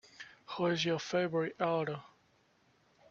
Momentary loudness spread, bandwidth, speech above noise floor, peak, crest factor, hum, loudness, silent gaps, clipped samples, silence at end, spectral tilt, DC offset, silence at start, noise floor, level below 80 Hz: 14 LU; 7.6 kHz; 37 dB; -16 dBFS; 20 dB; none; -34 LUFS; none; under 0.1%; 1.05 s; -5 dB/octave; under 0.1%; 0.2 s; -70 dBFS; -76 dBFS